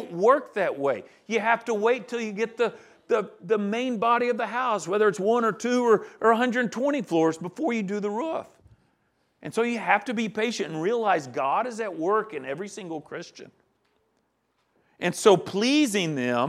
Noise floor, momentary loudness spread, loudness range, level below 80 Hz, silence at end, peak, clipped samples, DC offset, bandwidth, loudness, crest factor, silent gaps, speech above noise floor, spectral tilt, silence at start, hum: -72 dBFS; 11 LU; 5 LU; -76 dBFS; 0 s; -4 dBFS; under 0.1%; under 0.1%; 14 kHz; -25 LUFS; 22 dB; none; 47 dB; -4.5 dB/octave; 0 s; none